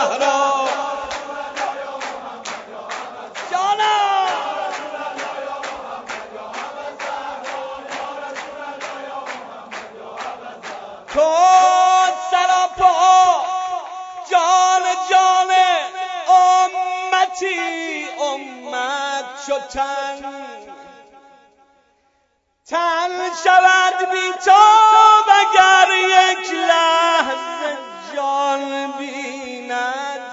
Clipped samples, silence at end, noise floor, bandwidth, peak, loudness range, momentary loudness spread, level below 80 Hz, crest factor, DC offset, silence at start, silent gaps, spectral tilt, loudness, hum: under 0.1%; 0 s; -65 dBFS; 7.8 kHz; 0 dBFS; 17 LU; 19 LU; -60 dBFS; 18 dB; under 0.1%; 0 s; none; -0.5 dB/octave; -16 LUFS; none